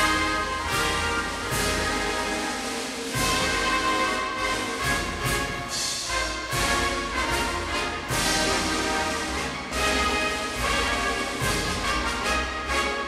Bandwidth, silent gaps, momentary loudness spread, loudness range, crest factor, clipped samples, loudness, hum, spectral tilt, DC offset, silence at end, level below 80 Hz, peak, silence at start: 16 kHz; none; 4 LU; 1 LU; 16 dB; under 0.1%; -25 LUFS; none; -2.5 dB/octave; under 0.1%; 0 s; -38 dBFS; -10 dBFS; 0 s